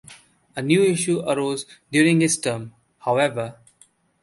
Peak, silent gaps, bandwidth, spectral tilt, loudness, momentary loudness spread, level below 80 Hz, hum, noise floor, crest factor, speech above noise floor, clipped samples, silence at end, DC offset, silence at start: -4 dBFS; none; 12 kHz; -4.5 dB/octave; -21 LUFS; 15 LU; -64 dBFS; none; -58 dBFS; 18 dB; 37 dB; under 0.1%; 0.7 s; under 0.1%; 0.1 s